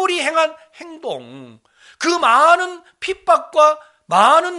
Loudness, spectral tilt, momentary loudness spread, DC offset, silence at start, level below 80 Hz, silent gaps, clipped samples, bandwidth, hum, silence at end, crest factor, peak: -15 LUFS; -2.5 dB/octave; 16 LU; under 0.1%; 0 s; -64 dBFS; none; under 0.1%; 11.5 kHz; none; 0 s; 16 dB; 0 dBFS